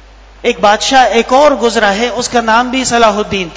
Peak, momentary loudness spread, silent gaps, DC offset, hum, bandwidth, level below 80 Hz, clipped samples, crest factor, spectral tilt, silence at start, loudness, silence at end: 0 dBFS; 6 LU; none; under 0.1%; none; 8 kHz; -36 dBFS; 0.9%; 10 dB; -3 dB/octave; 0.45 s; -10 LUFS; 0 s